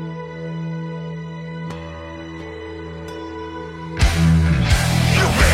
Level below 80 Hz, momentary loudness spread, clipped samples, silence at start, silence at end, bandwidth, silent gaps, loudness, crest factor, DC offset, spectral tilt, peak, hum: -26 dBFS; 16 LU; under 0.1%; 0 s; 0 s; 16 kHz; none; -20 LUFS; 18 dB; under 0.1%; -5 dB/octave; -2 dBFS; none